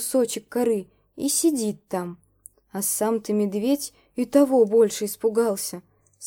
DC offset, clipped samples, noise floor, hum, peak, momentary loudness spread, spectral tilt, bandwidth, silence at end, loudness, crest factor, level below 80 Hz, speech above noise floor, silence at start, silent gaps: under 0.1%; under 0.1%; -53 dBFS; none; -6 dBFS; 13 LU; -4 dB/octave; 19 kHz; 0 s; -23 LUFS; 18 dB; -68 dBFS; 30 dB; 0 s; none